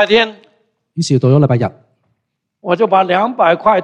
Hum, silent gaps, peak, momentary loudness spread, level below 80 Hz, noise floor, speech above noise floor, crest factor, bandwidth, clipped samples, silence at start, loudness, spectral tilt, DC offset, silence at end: none; none; 0 dBFS; 11 LU; -54 dBFS; -71 dBFS; 59 dB; 14 dB; 9.8 kHz; under 0.1%; 0 s; -13 LUFS; -6 dB/octave; under 0.1%; 0 s